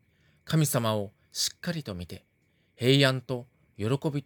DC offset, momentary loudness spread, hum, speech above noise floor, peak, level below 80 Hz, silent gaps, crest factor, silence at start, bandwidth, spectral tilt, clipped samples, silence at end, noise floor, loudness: under 0.1%; 16 LU; none; 41 dB; -8 dBFS; -66 dBFS; none; 22 dB; 0.45 s; 19.5 kHz; -4.5 dB/octave; under 0.1%; 0.05 s; -68 dBFS; -28 LUFS